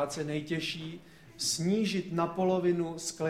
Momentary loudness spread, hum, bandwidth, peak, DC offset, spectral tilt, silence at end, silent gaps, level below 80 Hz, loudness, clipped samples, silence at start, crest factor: 9 LU; none; 16 kHz; -16 dBFS; under 0.1%; -4.5 dB/octave; 0 s; none; -66 dBFS; -31 LUFS; under 0.1%; 0 s; 16 dB